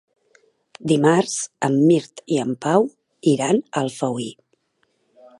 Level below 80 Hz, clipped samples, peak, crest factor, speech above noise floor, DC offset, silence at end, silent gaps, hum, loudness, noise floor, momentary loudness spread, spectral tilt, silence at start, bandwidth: -70 dBFS; under 0.1%; -2 dBFS; 18 dB; 49 dB; under 0.1%; 1.05 s; none; none; -20 LUFS; -68 dBFS; 9 LU; -5.5 dB/octave; 0.85 s; 11.5 kHz